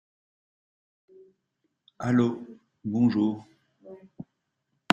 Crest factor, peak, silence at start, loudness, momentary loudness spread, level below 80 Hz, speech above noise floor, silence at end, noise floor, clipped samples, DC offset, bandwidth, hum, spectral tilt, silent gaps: 28 dB; -2 dBFS; 2 s; -27 LUFS; 25 LU; -68 dBFS; 54 dB; 0.7 s; -79 dBFS; under 0.1%; under 0.1%; 7.2 kHz; none; -6.5 dB/octave; none